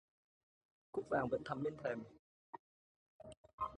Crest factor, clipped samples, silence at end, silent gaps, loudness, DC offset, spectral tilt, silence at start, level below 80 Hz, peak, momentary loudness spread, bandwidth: 22 dB; under 0.1%; 0 s; 2.19-2.53 s, 2.59-3.19 s, 3.37-3.44 s, 3.53-3.58 s; -42 LUFS; under 0.1%; -7 dB/octave; 0.95 s; -72 dBFS; -24 dBFS; 21 LU; 10 kHz